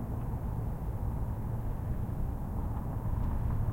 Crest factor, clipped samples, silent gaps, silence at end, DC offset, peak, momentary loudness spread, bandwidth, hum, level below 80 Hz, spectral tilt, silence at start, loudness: 12 dB; under 0.1%; none; 0 s; under 0.1%; -22 dBFS; 3 LU; 16.5 kHz; none; -36 dBFS; -9.5 dB/octave; 0 s; -36 LUFS